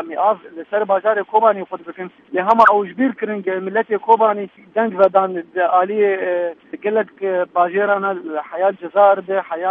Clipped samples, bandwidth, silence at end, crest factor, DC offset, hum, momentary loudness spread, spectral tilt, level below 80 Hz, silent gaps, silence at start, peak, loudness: under 0.1%; 6.6 kHz; 0 s; 18 dB; under 0.1%; none; 11 LU; -7.5 dB/octave; -66 dBFS; none; 0 s; 0 dBFS; -17 LUFS